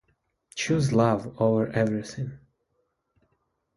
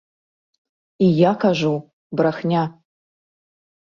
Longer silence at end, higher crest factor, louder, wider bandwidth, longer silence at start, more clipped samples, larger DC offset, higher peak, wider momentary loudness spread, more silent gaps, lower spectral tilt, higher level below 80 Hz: first, 1.4 s vs 1.1 s; about the same, 20 dB vs 18 dB; second, -25 LUFS vs -20 LUFS; first, 11.5 kHz vs 7.2 kHz; second, 0.55 s vs 1 s; neither; neither; about the same, -6 dBFS vs -4 dBFS; about the same, 14 LU vs 12 LU; second, none vs 1.93-2.10 s; about the same, -6.5 dB/octave vs -7.5 dB/octave; about the same, -58 dBFS vs -62 dBFS